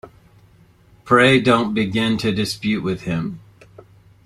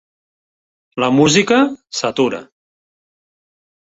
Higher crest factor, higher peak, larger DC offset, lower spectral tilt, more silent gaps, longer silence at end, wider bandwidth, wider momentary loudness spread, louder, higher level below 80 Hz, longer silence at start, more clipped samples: about the same, 18 dB vs 18 dB; about the same, -2 dBFS vs -2 dBFS; neither; first, -5.5 dB/octave vs -4 dB/octave; neither; second, 0.9 s vs 1.55 s; first, 13.5 kHz vs 8 kHz; about the same, 12 LU vs 13 LU; second, -18 LUFS vs -15 LUFS; first, -52 dBFS vs -58 dBFS; second, 0.05 s vs 0.95 s; neither